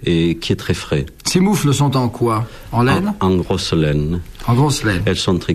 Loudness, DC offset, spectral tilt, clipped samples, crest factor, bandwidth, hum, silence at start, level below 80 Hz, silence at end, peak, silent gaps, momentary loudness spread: -17 LUFS; under 0.1%; -5.5 dB/octave; under 0.1%; 14 dB; 14.5 kHz; none; 0 s; -36 dBFS; 0 s; -2 dBFS; none; 5 LU